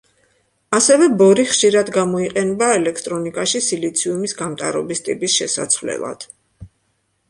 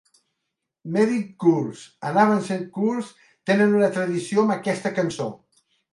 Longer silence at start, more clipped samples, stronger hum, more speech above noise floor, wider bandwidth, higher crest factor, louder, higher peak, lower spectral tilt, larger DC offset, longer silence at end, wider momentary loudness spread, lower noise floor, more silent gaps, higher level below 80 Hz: second, 0.7 s vs 0.85 s; neither; neither; second, 49 dB vs 59 dB; about the same, 11.5 kHz vs 11.5 kHz; about the same, 18 dB vs 18 dB; first, -17 LUFS vs -22 LUFS; first, 0 dBFS vs -4 dBFS; second, -3 dB/octave vs -6.5 dB/octave; neither; about the same, 0.65 s vs 0.55 s; about the same, 12 LU vs 13 LU; second, -66 dBFS vs -81 dBFS; neither; first, -56 dBFS vs -70 dBFS